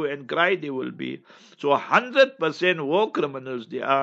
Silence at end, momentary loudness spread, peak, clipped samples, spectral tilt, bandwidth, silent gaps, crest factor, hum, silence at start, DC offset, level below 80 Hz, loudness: 0 s; 13 LU; -4 dBFS; under 0.1%; -5.5 dB/octave; 7.8 kHz; none; 20 dB; none; 0 s; under 0.1%; -82 dBFS; -23 LUFS